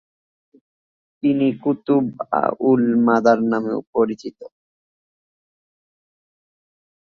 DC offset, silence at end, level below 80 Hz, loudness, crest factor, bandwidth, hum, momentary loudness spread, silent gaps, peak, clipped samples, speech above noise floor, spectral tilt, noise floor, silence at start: under 0.1%; 2.55 s; -64 dBFS; -19 LUFS; 18 dB; 6.8 kHz; none; 8 LU; 3.87-3.93 s; -2 dBFS; under 0.1%; over 72 dB; -8 dB/octave; under -90 dBFS; 1.25 s